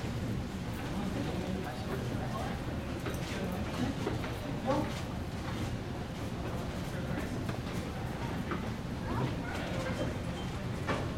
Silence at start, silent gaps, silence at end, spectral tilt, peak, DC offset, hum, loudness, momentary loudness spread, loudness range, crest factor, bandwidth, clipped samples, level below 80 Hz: 0 s; none; 0 s; -6 dB/octave; -18 dBFS; under 0.1%; none; -37 LUFS; 4 LU; 2 LU; 16 dB; 16.5 kHz; under 0.1%; -46 dBFS